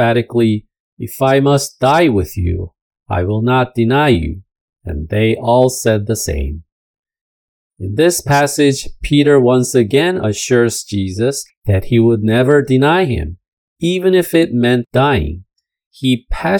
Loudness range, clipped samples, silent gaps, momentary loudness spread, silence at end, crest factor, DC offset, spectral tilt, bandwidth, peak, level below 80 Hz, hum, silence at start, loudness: 4 LU; under 0.1%; 0.80-0.97 s, 2.81-2.91 s, 4.61-4.68 s, 6.72-7.03 s, 7.21-7.70 s, 11.57-11.62 s, 13.48-13.76 s, 15.86-15.91 s; 12 LU; 0 s; 14 dB; under 0.1%; -5.5 dB/octave; 18 kHz; 0 dBFS; -34 dBFS; none; 0 s; -14 LUFS